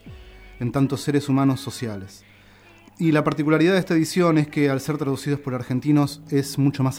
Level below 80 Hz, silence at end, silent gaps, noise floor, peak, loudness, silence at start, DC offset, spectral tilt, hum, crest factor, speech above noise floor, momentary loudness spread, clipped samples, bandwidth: -52 dBFS; 0 s; none; -50 dBFS; -6 dBFS; -22 LUFS; 0.05 s; under 0.1%; -6.5 dB/octave; none; 16 dB; 29 dB; 10 LU; under 0.1%; 19.5 kHz